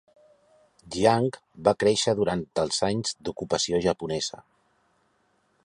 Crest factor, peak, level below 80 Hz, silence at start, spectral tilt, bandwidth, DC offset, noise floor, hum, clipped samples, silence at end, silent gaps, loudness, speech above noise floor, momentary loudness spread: 22 dB; -6 dBFS; -56 dBFS; 0.85 s; -4 dB/octave; 11.5 kHz; under 0.1%; -69 dBFS; none; under 0.1%; 1.3 s; none; -26 LUFS; 43 dB; 9 LU